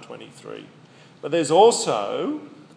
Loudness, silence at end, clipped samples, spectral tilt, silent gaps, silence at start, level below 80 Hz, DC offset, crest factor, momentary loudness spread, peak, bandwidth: -20 LUFS; 0.3 s; under 0.1%; -3.5 dB/octave; none; 0 s; -82 dBFS; under 0.1%; 20 dB; 23 LU; -2 dBFS; 10.5 kHz